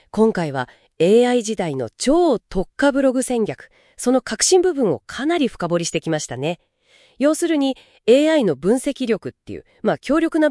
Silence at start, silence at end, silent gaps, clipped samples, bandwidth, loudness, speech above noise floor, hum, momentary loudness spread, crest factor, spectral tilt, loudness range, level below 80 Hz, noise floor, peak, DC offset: 0.15 s; 0 s; none; under 0.1%; 12 kHz; -19 LUFS; 37 dB; none; 11 LU; 16 dB; -4.5 dB/octave; 2 LU; -46 dBFS; -55 dBFS; -2 dBFS; under 0.1%